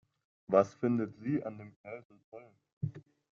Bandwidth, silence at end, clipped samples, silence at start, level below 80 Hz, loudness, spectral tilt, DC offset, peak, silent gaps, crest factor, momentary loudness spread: 7.4 kHz; 0.35 s; under 0.1%; 0.5 s; -72 dBFS; -33 LUFS; -9 dB/octave; under 0.1%; -12 dBFS; 1.76-1.84 s, 2.05-2.10 s, 2.24-2.32 s, 2.73-2.81 s; 24 dB; 25 LU